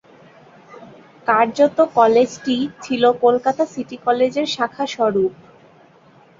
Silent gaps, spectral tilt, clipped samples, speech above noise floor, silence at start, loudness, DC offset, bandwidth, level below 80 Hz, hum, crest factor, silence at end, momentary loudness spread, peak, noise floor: none; -4.5 dB/octave; under 0.1%; 33 dB; 0.8 s; -18 LUFS; under 0.1%; 7.6 kHz; -62 dBFS; none; 16 dB; 1.1 s; 9 LU; -2 dBFS; -50 dBFS